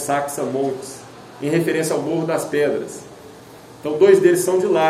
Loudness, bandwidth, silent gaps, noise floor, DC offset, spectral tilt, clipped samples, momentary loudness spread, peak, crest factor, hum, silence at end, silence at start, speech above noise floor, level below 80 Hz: -19 LUFS; 15.5 kHz; none; -41 dBFS; under 0.1%; -5 dB/octave; under 0.1%; 21 LU; -2 dBFS; 18 dB; none; 0 s; 0 s; 23 dB; -62 dBFS